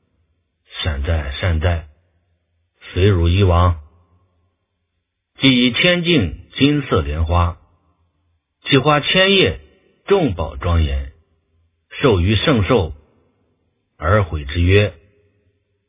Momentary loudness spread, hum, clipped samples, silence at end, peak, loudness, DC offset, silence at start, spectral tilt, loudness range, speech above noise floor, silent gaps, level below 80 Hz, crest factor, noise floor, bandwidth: 13 LU; none; under 0.1%; 0.95 s; 0 dBFS; -16 LUFS; under 0.1%; 0.75 s; -10.5 dB/octave; 3 LU; 58 dB; none; -26 dBFS; 18 dB; -73 dBFS; 3.9 kHz